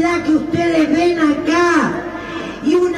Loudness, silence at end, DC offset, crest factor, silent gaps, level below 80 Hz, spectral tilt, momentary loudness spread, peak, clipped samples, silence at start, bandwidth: -16 LUFS; 0 s; under 0.1%; 12 dB; none; -46 dBFS; -5 dB/octave; 11 LU; -2 dBFS; under 0.1%; 0 s; 10.5 kHz